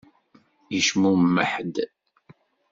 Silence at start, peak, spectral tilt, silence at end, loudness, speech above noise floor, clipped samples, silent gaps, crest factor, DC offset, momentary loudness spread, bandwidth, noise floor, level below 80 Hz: 0.7 s; -6 dBFS; -4.5 dB/octave; 0.85 s; -22 LUFS; 38 dB; under 0.1%; none; 18 dB; under 0.1%; 11 LU; 7.8 kHz; -60 dBFS; -66 dBFS